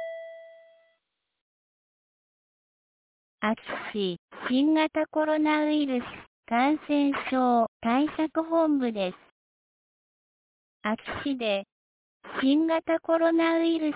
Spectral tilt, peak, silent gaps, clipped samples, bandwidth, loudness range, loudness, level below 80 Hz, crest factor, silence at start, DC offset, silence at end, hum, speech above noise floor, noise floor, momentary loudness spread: -9 dB/octave; -14 dBFS; 1.41-3.38 s, 4.18-4.28 s, 6.27-6.43 s, 7.68-7.80 s, 9.31-10.80 s, 11.72-12.20 s; under 0.1%; 4 kHz; 10 LU; -26 LUFS; -66 dBFS; 14 dB; 0 s; under 0.1%; 0 s; none; 54 dB; -79 dBFS; 10 LU